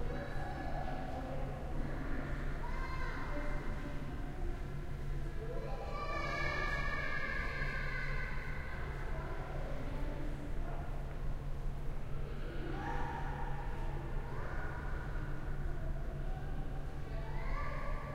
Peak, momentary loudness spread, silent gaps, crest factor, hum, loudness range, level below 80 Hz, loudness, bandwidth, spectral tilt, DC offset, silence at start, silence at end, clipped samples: -22 dBFS; 7 LU; none; 14 dB; none; 5 LU; -40 dBFS; -42 LUFS; 9 kHz; -6.5 dB/octave; under 0.1%; 0 s; 0 s; under 0.1%